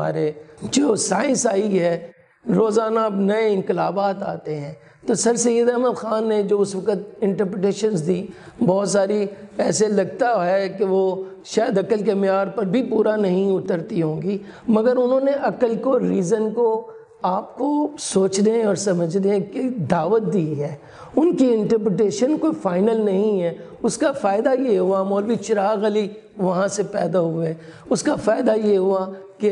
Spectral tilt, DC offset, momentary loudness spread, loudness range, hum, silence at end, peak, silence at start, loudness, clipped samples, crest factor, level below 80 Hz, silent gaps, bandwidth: -5.5 dB/octave; under 0.1%; 8 LU; 1 LU; none; 0 s; -4 dBFS; 0 s; -20 LUFS; under 0.1%; 16 dB; -62 dBFS; none; 11.5 kHz